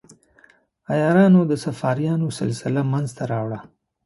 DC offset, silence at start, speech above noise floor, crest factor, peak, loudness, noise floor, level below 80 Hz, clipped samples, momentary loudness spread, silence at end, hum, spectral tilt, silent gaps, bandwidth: under 0.1%; 0.9 s; 36 dB; 16 dB; -4 dBFS; -21 LUFS; -56 dBFS; -60 dBFS; under 0.1%; 11 LU; 0.45 s; none; -7.5 dB/octave; none; 11.5 kHz